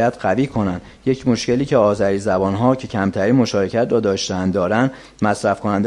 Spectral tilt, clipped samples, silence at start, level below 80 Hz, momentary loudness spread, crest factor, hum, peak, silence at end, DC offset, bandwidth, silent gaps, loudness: -6 dB/octave; under 0.1%; 0 s; -48 dBFS; 6 LU; 16 dB; none; -2 dBFS; 0 s; under 0.1%; 11.5 kHz; none; -18 LUFS